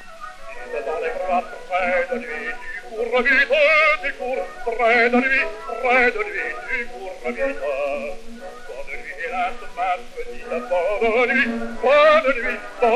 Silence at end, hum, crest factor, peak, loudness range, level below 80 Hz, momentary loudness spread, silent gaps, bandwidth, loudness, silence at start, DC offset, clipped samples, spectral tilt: 0 s; none; 18 dB; -2 dBFS; 9 LU; -40 dBFS; 18 LU; none; 12.5 kHz; -20 LUFS; 0 s; under 0.1%; under 0.1%; -3.5 dB/octave